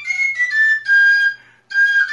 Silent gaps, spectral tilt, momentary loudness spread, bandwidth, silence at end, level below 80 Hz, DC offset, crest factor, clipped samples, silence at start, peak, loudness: none; 2.5 dB/octave; 7 LU; 11 kHz; 0 s; -76 dBFS; under 0.1%; 10 dB; under 0.1%; 0 s; -6 dBFS; -13 LUFS